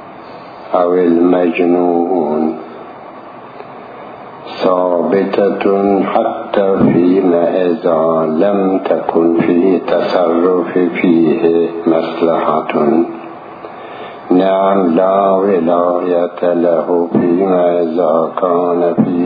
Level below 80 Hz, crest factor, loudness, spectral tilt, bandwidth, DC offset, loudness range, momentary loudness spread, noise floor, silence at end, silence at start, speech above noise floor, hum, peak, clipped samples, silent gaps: -56 dBFS; 12 dB; -13 LUFS; -9.5 dB/octave; 5 kHz; under 0.1%; 4 LU; 19 LU; -32 dBFS; 0 s; 0 s; 20 dB; none; 0 dBFS; under 0.1%; none